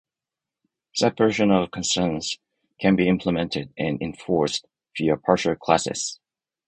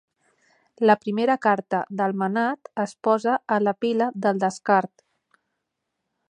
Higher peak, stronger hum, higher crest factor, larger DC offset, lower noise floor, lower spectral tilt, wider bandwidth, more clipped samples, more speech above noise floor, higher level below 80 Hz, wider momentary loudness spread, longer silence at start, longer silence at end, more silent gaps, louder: about the same, -2 dBFS vs -2 dBFS; neither; about the same, 22 dB vs 22 dB; neither; first, -88 dBFS vs -80 dBFS; second, -4.5 dB/octave vs -6 dB/octave; about the same, 10 kHz vs 10.5 kHz; neither; first, 66 dB vs 58 dB; first, -52 dBFS vs -78 dBFS; first, 10 LU vs 6 LU; first, 0.95 s vs 0.8 s; second, 0.55 s vs 1.45 s; neither; about the same, -23 LUFS vs -23 LUFS